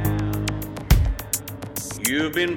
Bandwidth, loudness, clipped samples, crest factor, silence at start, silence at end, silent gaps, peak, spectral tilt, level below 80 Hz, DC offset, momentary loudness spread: over 20 kHz; -24 LUFS; under 0.1%; 20 dB; 0 s; 0 s; none; -2 dBFS; -4.5 dB/octave; -28 dBFS; under 0.1%; 10 LU